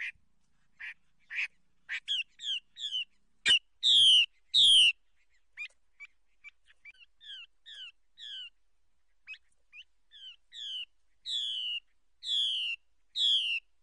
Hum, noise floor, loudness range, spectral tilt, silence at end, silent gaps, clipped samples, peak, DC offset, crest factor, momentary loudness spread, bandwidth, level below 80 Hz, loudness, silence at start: none; -79 dBFS; 24 LU; 3 dB/octave; 0.25 s; none; under 0.1%; -16 dBFS; under 0.1%; 16 dB; 26 LU; 10 kHz; -76 dBFS; -26 LUFS; 0 s